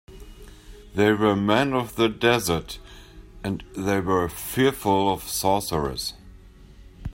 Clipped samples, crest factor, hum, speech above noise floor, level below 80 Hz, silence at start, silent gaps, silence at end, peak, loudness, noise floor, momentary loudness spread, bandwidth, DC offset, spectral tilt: under 0.1%; 20 dB; none; 24 dB; -46 dBFS; 0.1 s; none; 0 s; -6 dBFS; -23 LUFS; -47 dBFS; 12 LU; 16.5 kHz; under 0.1%; -4.5 dB/octave